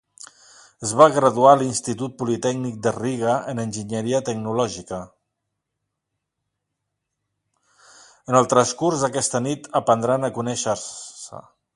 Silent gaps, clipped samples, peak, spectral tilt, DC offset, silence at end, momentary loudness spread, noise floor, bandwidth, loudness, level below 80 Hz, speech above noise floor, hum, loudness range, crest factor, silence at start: none; under 0.1%; 0 dBFS; -4.5 dB/octave; under 0.1%; 0.35 s; 17 LU; -80 dBFS; 11.5 kHz; -21 LUFS; -60 dBFS; 60 dB; none; 10 LU; 22 dB; 0.2 s